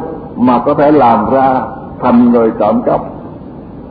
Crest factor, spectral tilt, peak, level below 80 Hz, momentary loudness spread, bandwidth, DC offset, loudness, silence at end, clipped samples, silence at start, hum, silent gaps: 12 dB; -11 dB/octave; 0 dBFS; -40 dBFS; 20 LU; 4.9 kHz; under 0.1%; -10 LUFS; 0 s; under 0.1%; 0 s; none; none